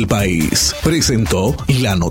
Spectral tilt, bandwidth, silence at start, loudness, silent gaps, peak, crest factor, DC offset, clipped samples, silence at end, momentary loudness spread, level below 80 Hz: -4.5 dB/octave; 17 kHz; 0 s; -15 LUFS; none; 0 dBFS; 14 dB; under 0.1%; under 0.1%; 0 s; 2 LU; -28 dBFS